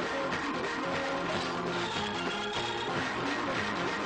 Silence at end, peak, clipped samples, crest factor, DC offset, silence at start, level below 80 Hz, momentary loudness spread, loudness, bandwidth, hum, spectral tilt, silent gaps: 0 s; -20 dBFS; under 0.1%; 12 dB; under 0.1%; 0 s; -60 dBFS; 1 LU; -32 LUFS; 10.5 kHz; none; -4 dB/octave; none